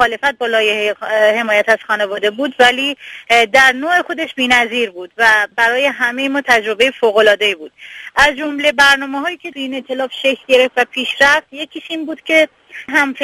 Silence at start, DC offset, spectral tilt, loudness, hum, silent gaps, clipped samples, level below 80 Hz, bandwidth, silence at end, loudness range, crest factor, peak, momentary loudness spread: 0 s; under 0.1%; -2 dB/octave; -13 LUFS; none; none; under 0.1%; -50 dBFS; 14.5 kHz; 0 s; 2 LU; 14 dB; 0 dBFS; 12 LU